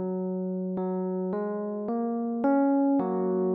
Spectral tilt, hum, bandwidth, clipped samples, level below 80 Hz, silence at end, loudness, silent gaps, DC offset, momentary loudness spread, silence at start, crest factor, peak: -11 dB/octave; none; 2.4 kHz; under 0.1%; -76 dBFS; 0 s; -28 LUFS; none; under 0.1%; 8 LU; 0 s; 12 dB; -16 dBFS